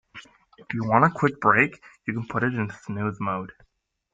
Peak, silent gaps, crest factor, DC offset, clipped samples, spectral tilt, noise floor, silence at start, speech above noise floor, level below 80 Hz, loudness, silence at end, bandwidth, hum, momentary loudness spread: -4 dBFS; none; 22 dB; under 0.1%; under 0.1%; -8 dB/octave; -48 dBFS; 0.15 s; 24 dB; -60 dBFS; -24 LUFS; 0.65 s; 7.8 kHz; none; 13 LU